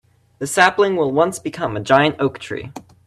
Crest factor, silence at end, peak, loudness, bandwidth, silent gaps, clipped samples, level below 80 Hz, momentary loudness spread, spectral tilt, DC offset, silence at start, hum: 18 dB; 0.25 s; 0 dBFS; -17 LUFS; 14 kHz; none; under 0.1%; -54 dBFS; 15 LU; -4.5 dB/octave; under 0.1%; 0.4 s; none